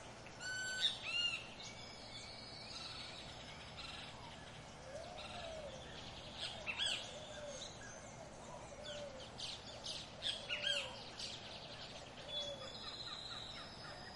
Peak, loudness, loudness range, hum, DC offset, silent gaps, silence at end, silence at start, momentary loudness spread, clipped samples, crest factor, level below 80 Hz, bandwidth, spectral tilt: -24 dBFS; -45 LUFS; 7 LU; none; under 0.1%; none; 0 s; 0 s; 14 LU; under 0.1%; 24 dB; -66 dBFS; 11.5 kHz; -2 dB/octave